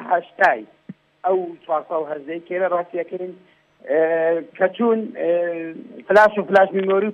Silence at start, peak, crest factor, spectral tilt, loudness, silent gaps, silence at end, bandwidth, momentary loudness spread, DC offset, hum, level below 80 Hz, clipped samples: 0 s; -4 dBFS; 16 dB; -6.5 dB/octave; -20 LUFS; none; 0 s; 9 kHz; 14 LU; under 0.1%; none; -68 dBFS; under 0.1%